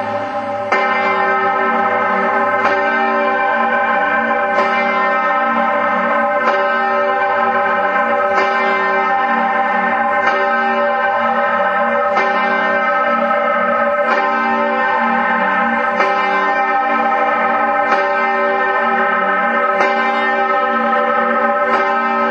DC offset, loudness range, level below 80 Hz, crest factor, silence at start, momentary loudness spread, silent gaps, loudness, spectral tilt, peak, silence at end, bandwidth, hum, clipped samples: under 0.1%; 0 LU; -60 dBFS; 14 dB; 0 s; 1 LU; none; -14 LUFS; -5 dB/octave; 0 dBFS; 0 s; 8.2 kHz; none; under 0.1%